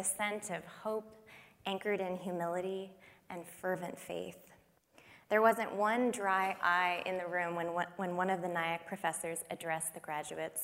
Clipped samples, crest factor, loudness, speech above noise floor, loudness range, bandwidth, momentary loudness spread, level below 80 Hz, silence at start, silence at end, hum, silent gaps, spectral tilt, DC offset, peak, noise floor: under 0.1%; 22 dB; -36 LUFS; 29 dB; 7 LU; 16 kHz; 13 LU; -80 dBFS; 0 s; 0 s; none; none; -3.5 dB/octave; under 0.1%; -14 dBFS; -65 dBFS